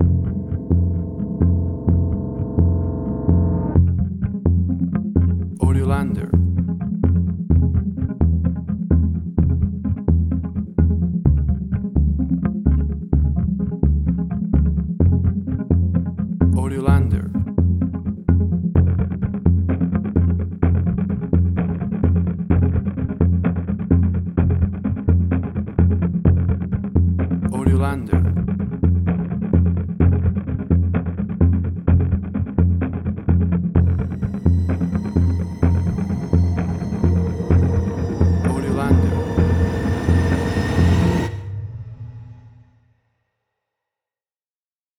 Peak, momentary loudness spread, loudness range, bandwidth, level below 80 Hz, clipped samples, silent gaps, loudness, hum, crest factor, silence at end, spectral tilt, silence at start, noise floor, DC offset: -2 dBFS; 5 LU; 1 LU; 6.2 kHz; -26 dBFS; under 0.1%; none; -20 LUFS; none; 16 dB; 2.5 s; -9.5 dB/octave; 0 s; under -90 dBFS; under 0.1%